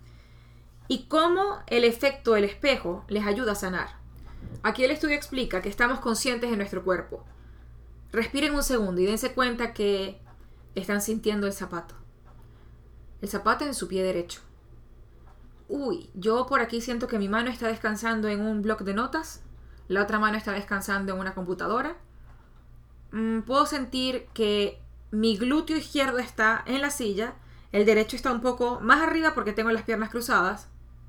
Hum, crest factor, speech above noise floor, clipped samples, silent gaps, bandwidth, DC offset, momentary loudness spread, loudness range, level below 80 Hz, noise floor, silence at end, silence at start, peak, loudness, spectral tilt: none; 24 dB; 24 dB; under 0.1%; none; 19.5 kHz; under 0.1%; 9 LU; 7 LU; -46 dBFS; -51 dBFS; 0.05 s; 0.05 s; -4 dBFS; -26 LUFS; -4 dB/octave